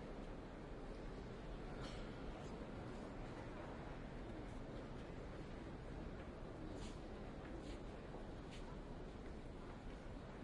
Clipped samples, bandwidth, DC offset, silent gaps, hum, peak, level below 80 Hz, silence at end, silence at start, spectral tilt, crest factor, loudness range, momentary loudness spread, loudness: under 0.1%; 11 kHz; under 0.1%; none; none; -36 dBFS; -56 dBFS; 0 s; 0 s; -6.5 dB/octave; 14 dB; 1 LU; 2 LU; -53 LUFS